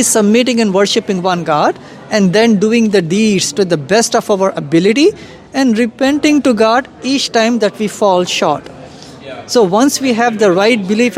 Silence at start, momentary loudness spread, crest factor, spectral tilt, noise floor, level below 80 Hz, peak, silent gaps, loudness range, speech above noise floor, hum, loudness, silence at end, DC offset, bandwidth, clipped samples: 0 s; 6 LU; 12 dB; -4 dB/octave; -33 dBFS; -54 dBFS; 0 dBFS; none; 2 LU; 21 dB; none; -12 LUFS; 0 s; under 0.1%; 15.5 kHz; under 0.1%